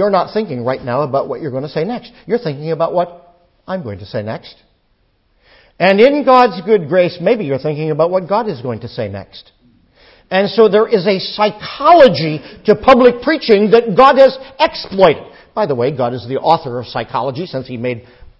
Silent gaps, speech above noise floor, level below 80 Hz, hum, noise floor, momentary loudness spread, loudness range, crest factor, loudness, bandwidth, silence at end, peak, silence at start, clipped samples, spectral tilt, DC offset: none; 45 dB; -48 dBFS; none; -59 dBFS; 15 LU; 10 LU; 14 dB; -14 LUFS; 8 kHz; 0.4 s; 0 dBFS; 0 s; 0.3%; -7.5 dB/octave; under 0.1%